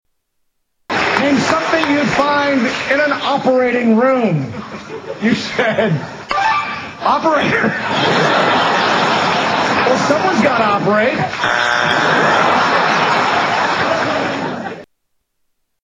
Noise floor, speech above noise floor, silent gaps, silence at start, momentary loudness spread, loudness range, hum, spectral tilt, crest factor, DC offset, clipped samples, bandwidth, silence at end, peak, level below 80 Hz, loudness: -67 dBFS; 53 dB; none; 0.9 s; 8 LU; 3 LU; none; -4.5 dB/octave; 14 dB; under 0.1%; under 0.1%; 10 kHz; 1 s; -2 dBFS; -52 dBFS; -14 LUFS